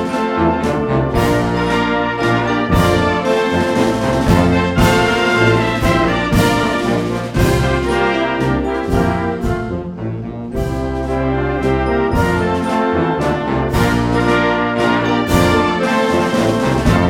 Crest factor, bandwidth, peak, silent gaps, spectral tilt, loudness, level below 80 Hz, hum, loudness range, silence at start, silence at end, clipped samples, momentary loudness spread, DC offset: 14 dB; 17 kHz; 0 dBFS; none; -6 dB/octave; -15 LUFS; -28 dBFS; none; 5 LU; 0 s; 0 s; under 0.1%; 6 LU; under 0.1%